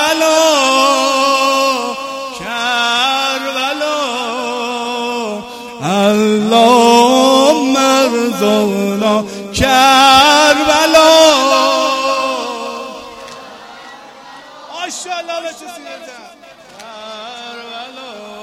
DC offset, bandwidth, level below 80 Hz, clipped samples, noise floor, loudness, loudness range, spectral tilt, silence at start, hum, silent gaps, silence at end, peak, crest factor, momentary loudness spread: under 0.1%; 16.5 kHz; -44 dBFS; under 0.1%; -38 dBFS; -11 LUFS; 17 LU; -2.5 dB/octave; 0 s; none; none; 0 s; 0 dBFS; 14 dB; 22 LU